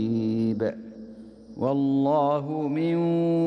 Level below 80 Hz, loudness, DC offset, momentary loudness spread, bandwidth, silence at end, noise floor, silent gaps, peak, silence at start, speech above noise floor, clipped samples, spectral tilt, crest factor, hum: -64 dBFS; -25 LUFS; under 0.1%; 20 LU; 6 kHz; 0 s; -44 dBFS; none; -12 dBFS; 0 s; 21 dB; under 0.1%; -9.5 dB/octave; 12 dB; none